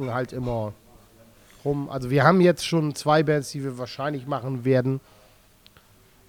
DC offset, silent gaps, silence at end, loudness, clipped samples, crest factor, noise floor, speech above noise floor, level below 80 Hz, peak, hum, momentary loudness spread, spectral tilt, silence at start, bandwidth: under 0.1%; none; 1.3 s; -24 LUFS; under 0.1%; 22 dB; -56 dBFS; 33 dB; -54 dBFS; -2 dBFS; none; 13 LU; -6.5 dB/octave; 0 s; 19.5 kHz